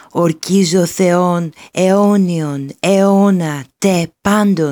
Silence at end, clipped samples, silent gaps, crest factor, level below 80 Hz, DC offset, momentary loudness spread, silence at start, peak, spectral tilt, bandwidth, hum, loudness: 0 s; under 0.1%; none; 14 dB; -52 dBFS; under 0.1%; 8 LU; 0.15 s; 0 dBFS; -6 dB/octave; 19 kHz; none; -14 LUFS